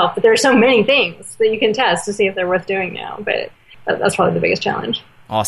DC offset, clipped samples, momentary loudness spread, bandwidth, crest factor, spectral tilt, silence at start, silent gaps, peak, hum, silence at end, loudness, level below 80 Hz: under 0.1%; under 0.1%; 12 LU; 12.5 kHz; 14 dB; -4 dB/octave; 0 s; none; -2 dBFS; none; 0 s; -16 LUFS; -56 dBFS